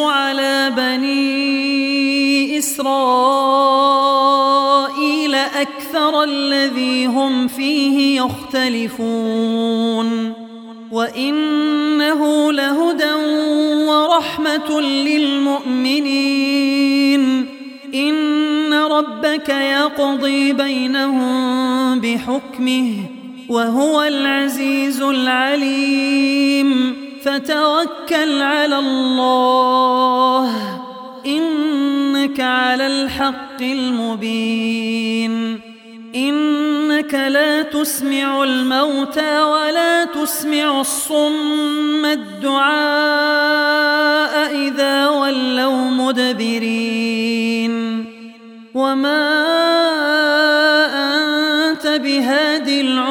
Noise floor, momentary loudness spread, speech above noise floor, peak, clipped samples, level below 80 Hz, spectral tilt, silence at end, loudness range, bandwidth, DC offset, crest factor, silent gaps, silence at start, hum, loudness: -37 dBFS; 7 LU; 22 dB; -2 dBFS; under 0.1%; -60 dBFS; -3 dB/octave; 0 s; 4 LU; 18 kHz; under 0.1%; 14 dB; none; 0 s; none; -16 LUFS